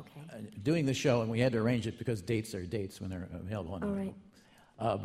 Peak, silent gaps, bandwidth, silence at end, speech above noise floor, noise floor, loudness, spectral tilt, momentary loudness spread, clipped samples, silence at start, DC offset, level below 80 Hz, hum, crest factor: -16 dBFS; none; 15 kHz; 0 s; 28 dB; -61 dBFS; -34 LUFS; -6.5 dB/octave; 12 LU; under 0.1%; 0 s; under 0.1%; -60 dBFS; none; 18 dB